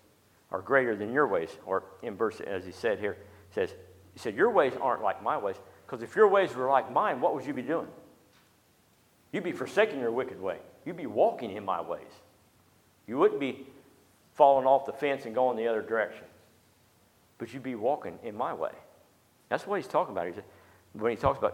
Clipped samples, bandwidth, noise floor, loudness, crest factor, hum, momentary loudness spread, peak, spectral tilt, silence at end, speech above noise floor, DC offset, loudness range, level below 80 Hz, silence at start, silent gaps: under 0.1%; 16 kHz; -65 dBFS; -29 LUFS; 24 dB; none; 15 LU; -8 dBFS; -6 dB/octave; 0 s; 36 dB; under 0.1%; 7 LU; -64 dBFS; 0.5 s; none